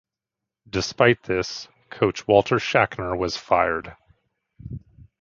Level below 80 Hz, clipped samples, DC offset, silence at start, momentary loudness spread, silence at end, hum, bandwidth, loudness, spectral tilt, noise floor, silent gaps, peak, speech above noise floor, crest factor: -48 dBFS; under 0.1%; under 0.1%; 0.75 s; 20 LU; 0.2 s; none; 7.6 kHz; -22 LUFS; -5 dB/octave; -87 dBFS; none; -2 dBFS; 65 dB; 22 dB